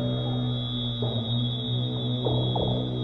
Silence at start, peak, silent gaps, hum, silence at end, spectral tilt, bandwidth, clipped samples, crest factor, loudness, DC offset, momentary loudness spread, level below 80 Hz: 0 s; -12 dBFS; none; none; 0 s; -9 dB/octave; 4.2 kHz; under 0.1%; 14 dB; -27 LUFS; under 0.1%; 3 LU; -46 dBFS